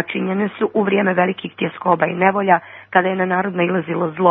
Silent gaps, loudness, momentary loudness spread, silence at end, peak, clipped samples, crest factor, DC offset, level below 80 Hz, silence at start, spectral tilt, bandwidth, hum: none; -18 LUFS; 5 LU; 0 s; 0 dBFS; under 0.1%; 18 dB; under 0.1%; -68 dBFS; 0 s; -10.5 dB/octave; 3.9 kHz; none